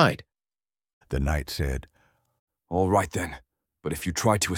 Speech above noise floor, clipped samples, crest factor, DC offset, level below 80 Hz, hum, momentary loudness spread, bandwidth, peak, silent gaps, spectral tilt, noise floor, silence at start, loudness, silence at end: over 65 dB; under 0.1%; 26 dB; under 0.1%; -38 dBFS; none; 13 LU; 17.5 kHz; -2 dBFS; 0.93-1.01 s, 2.39-2.47 s; -5 dB/octave; under -90 dBFS; 0 s; -27 LUFS; 0 s